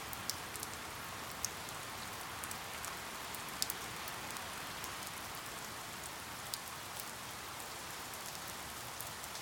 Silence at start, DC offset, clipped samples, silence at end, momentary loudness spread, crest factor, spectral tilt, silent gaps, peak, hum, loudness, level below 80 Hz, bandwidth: 0 s; under 0.1%; under 0.1%; 0 s; 3 LU; 32 dB; -1.5 dB/octave; none; -12 dBFS; none; -43 LUFS; -64 dBFS; 17.5 kHz